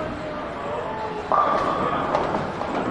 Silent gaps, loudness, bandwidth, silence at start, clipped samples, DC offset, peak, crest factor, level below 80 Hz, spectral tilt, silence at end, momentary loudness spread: none; -24 LUFS; 11 kHz; 0 s; under 0.1%; under 0.1%; -6 dBFS; 20 dB; -48 dBFS; -6 dB/octave; 0 s; 9 LU